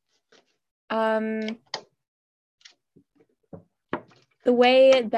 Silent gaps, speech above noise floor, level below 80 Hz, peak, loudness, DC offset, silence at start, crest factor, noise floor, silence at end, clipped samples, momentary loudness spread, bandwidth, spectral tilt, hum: 2.08-2.58 s; 46 dB; -72 dBFS; -8 dBFS; -21 LUFS; under 0.1%; 0.9 s; 18 dB; -66 dBFS; 0 s; under 0.1%; 20 LU; 8.4 kHz; -4.5 dB/octave; none